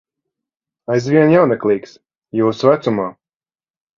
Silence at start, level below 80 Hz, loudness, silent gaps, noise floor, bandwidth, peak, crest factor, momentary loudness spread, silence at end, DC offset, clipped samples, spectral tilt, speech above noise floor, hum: 0.9 s; -60 dBFS; -15 LUFS; 2.18-2.22 s; under -90 dBFS; 7.4 kHz; 0 dBFS; 18 dB; 12 LU; 0.85 s; under 0.1%; under 0.1%; -7.5 dB/octave; over 76 dB; none